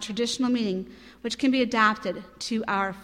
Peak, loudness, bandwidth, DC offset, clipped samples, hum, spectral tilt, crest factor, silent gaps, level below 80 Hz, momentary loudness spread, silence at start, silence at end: -8 dBFS; -26 LUFS; 13 kHz; under 0.1%; under 0.1%; none; -4 dB/octave; 18 dB; none; -60 dBFS; 12 LU; 0 s; 0 s